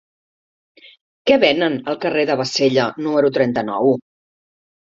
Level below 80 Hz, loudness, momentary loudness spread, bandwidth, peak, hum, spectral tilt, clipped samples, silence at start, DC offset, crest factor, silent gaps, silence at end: -60 dBFS; -18 LUFS; 6 LU; 7.8 kHz; -2 dBFS; none; -5 dB/octave; under 0.1%; 1.25 s; under 0.1%; 18 dB; none; 0.9 s